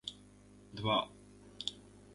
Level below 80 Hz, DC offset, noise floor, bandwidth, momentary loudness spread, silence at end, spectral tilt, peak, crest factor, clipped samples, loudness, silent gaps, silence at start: -66 dBFS; under 0.1%; -59 dBFS; 11.5 kHz; 24 LU; 0 s; -4.5 dB/octave; -18 dBFS; 22 dB; under 0.1%; -38 LUFS; none; 0.05 s